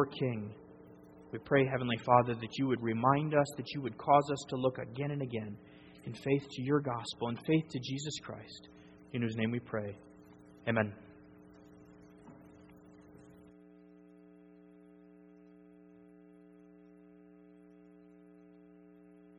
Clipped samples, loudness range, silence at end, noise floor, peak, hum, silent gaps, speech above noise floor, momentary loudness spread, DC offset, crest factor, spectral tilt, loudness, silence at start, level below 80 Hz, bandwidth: under 0.1%; 10 LU; 5.85 s; -58 dBFS; -10 dBFS; none; none; 25 dB; 26 LU; under 0.1%; 26 dB; -6.5 dB/octave; -33 LUFS; 0 s; -70 dBFS; 11.5 kHz